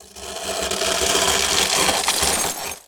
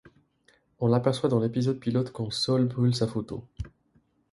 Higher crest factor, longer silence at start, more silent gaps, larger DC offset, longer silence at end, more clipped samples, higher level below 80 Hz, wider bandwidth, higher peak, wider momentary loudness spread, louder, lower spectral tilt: about the same, 20 dB vs 18 dB; second, 0 s vs 0.8 s; neither; neither; second, 0.1 s vs 0.65 s; neither; first, -44 dBFS vs -52 dBFS; first, over 20 kHz vs 11.5 kHz; first, 0 dBFS vs -10 dBFS; second, 9 LU vs 14 LU; first, -18 LUFS vs -27 LUFS; second, -0.5 dB/octave vs -7 dB/octave